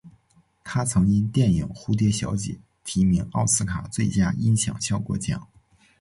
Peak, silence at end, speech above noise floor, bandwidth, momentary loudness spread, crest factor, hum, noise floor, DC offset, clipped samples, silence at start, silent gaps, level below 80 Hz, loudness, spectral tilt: -8 dBFS; 0.55 s; 39 dB; 11.5 kHz; 9 LU; 16 dB; none; -62 dBFS; under 0.1%; under 0.1%; 0.05 s; none; -42 dBFS; -24 LUFS; -5 dB/octave